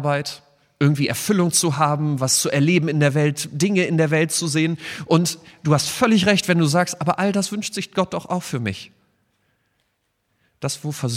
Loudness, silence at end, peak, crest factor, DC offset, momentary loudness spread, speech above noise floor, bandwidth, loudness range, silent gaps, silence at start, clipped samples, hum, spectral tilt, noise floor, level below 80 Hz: -20 LUFS; 0 s; -4 dBFS; 18 dB; under 0.1%; 9 LU; 51 dB; 16 kHz; 8 LU; none; 0 s; under 0.1%; none; -4.5 dB/octave; -71 dBFS; -60 dBFS